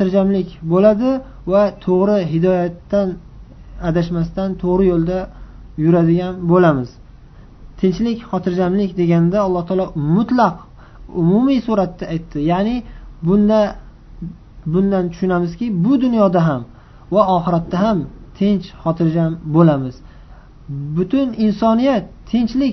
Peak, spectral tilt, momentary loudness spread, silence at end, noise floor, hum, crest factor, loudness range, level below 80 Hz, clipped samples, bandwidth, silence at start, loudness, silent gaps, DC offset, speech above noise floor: 0 dBFS; -9 dB/octave; 11 LU; 0 s; -40 dBFS; none; 16 dB; 2 LU; -38 dBFS; under 0.1%; 6.2 kHz; 0 s; -17 LUFS; none; under 0.1%; 25 dB